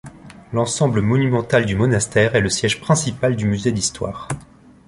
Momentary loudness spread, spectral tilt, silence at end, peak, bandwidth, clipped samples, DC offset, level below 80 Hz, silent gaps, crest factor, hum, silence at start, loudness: 10 LU; -5 dB/octave; 0.45 s; -2 dBFS; 11.5 kHz; under 0.1%; under 0.1%; -44 dBFS; none; 18 dB; none; 0.05 s; -19 LUFS